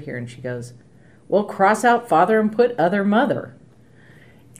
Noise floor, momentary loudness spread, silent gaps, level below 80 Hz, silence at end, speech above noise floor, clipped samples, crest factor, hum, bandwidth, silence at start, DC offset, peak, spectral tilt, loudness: -50 dBFS; 15 LU; none; -64 dBFS; 1.1 s; 31 dB; under 0.1%; 18 dB; none; 15.5 kHz; 0 s; 0.2%; -4 dBFS; -6 dB/octave; -19 LUFS